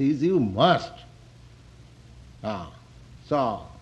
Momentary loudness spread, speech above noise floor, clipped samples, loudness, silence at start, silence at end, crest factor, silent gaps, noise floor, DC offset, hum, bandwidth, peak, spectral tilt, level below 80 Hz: 19 LU; 26 dB; under 0.1%; -25 LUFS; 0 s; 0.1 s; 22 dB; none; -49 dBFS; under 0.1%; none; 9.6 kHz; -4 dBFS; -7 dB/octave; -54 dBFS